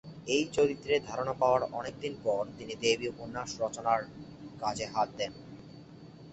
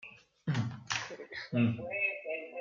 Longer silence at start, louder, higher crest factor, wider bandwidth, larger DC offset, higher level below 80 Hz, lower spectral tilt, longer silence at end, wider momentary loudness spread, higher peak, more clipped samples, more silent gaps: about the same, 0.05 s vs 0 s; first, -32 LUFS vs -35 LUFS; about the same, 20 dB vs 18 dB; first, 8.4 kHz vs 7.6 kHz; neither; first, -62 dBFS vs -72 dBFS; second, -4 dB/octave vs -5.5 dB/octave; about the same, 0 s vs 0 s; first, 21 LU vs 11 LU; first, -12 dBFS vs -16 dBFS; neither; neither